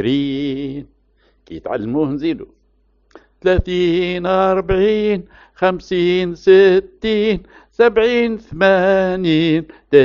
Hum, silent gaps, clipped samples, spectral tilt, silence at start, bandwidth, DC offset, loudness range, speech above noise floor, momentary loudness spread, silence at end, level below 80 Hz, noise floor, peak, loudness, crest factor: none; none; under 0.1%; -4.5 dB/octave; 0 s; 7 kHz; under 0.1%; 8 LU; 43 dB; 12 LU; 0 s; -38 dBFS; -58 dBFS; 0 dBFS; -16 LUFS; 16 dB